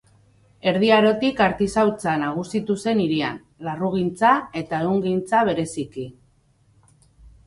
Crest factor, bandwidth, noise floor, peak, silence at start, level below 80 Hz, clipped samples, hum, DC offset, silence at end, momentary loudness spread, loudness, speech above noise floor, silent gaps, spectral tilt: 18 dB; 11.5 kHz; -60 dBFS; -4 dBFS; 0.65 s; -54 dBFS; under 0.1%; none; under 0.1%; 0.2 s; 12 LU; -21 LUFS; 39 dB; none; -6 dB/octave